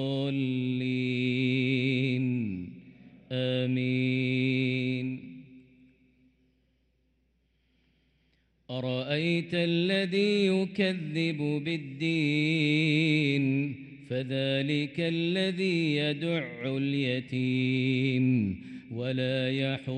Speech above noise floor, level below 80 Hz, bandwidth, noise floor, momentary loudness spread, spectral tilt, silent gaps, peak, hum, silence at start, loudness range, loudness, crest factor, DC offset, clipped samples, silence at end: 44 dB; -70 dBFS; 9.4 kHz; -72 dBFS; 9 LU; -7 dB/octave; none; -14 dBFS; none; 0 s; 7 LU; -28 LUFS; 16 dB; under 0.1%; under 0.1%; 0 s